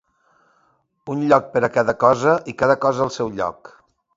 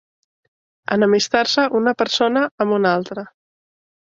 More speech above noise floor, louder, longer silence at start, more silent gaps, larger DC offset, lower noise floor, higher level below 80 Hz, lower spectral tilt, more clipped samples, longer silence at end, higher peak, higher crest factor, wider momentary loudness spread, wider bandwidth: second, 45 dB vs over 72 dB; about the same, -19 LUFS vs -18 LUFS; first, 1.05 s vs 0.9 s; second, none vs 2.51-2.58 s; neither; second, -63 dBFS vs under -90 dBFS; first, -56 dBFS vs -62 dBFS; first, -6 dB/octave vs -4 dB/octave; neither; second, 0.5 s vs 0.8 s; about the same, 0 dBFS vs -2 dBFS; about the same, 20 dB vs 18 dB; about the same, 10 LU vs 10 LU; about the same, 7.8 kHz vs 7.8 kHz